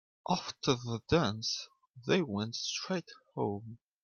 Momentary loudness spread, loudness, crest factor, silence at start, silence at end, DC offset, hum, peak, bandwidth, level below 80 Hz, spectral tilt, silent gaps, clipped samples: 14 LU; -34 LUFS; 20 dB; 0.25 s; 0.25 s; under 0.1%; none; -14 dBFS; 10 kHz; -62 dBFS; -4.5 dB/octave; none; under 0.1%